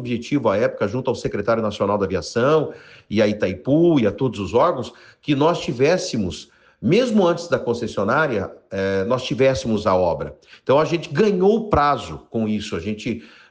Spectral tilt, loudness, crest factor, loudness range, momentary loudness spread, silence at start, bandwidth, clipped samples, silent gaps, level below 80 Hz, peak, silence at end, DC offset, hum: -6 dB/octave; -20 LUFS; 16 dB; 2 LU; 10 LU; 0 s; 9.6 kHz; under 0.1%; none; -46 dBFS; -4 dBFS; 0.25 s; under 0.1%; none